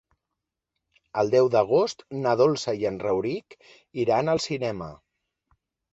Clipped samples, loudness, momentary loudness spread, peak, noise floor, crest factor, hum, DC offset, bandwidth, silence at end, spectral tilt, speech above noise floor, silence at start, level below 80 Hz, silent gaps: under 0.1%; -24 LUFS; 13 LU; -8 dBFS; -85 dBFS; 18 dB; none; under 0.1%; 8 kHz; 0.95 s; -5.5 dB/octave; 61 dB; 1.15 s; -60 dBFS; none